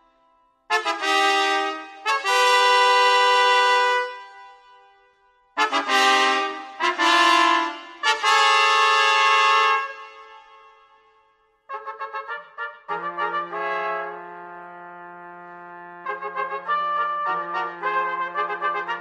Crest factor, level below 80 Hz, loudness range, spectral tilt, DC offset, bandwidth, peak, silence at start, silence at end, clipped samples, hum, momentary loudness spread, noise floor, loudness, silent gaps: 18 dB; -80 dBFS; 13 LU; 0 dB/octave; under 0.1%; 14.5 kHz; -4 dBFS; 0.7 s; 0 s; under 0.1%; none; 22 LU; -62 dBFS; -20 LUFS; none